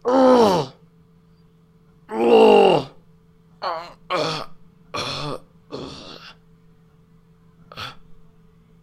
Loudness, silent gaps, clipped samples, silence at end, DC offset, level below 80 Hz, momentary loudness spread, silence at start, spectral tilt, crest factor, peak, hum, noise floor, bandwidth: -18 LUFS; none; under 0.1%; 0.7 s; under 0.1%; -54 dBFS; 25 LU; 0.05 s; -5.5 dB/octave; 20 dB; -2 dBFS; none; -54 dBFS; 14 kHz